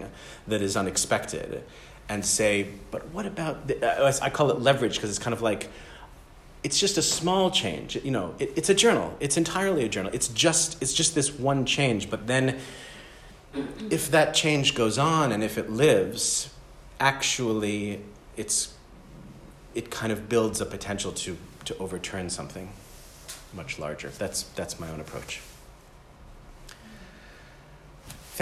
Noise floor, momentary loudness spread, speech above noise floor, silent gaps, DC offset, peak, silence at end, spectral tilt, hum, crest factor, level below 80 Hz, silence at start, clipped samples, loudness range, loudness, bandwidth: -51 dBFS; 18 LU; 24 dB; none; under 0.1%; -8 dBFS; 0 s; -3.5 dB/octave; none; 20 dB; -52 dBFS; 0 s; under 0.1%; 12 LU; -26 LUFS; 15 kHz